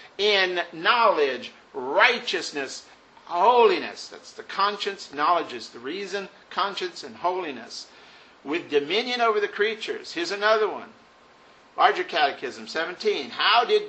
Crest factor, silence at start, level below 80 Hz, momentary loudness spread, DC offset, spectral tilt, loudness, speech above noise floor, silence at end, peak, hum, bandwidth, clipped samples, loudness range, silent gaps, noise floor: 22 dB; 0 s; -76 dBFS; 16 LU; under 0.1%; -2.5 dB/octave; -24 LUFS; 29 dB; 0 s; -2 dBFS; none; 8.4 kHz; under 0.1%; 6 LU; none; -54 dBFS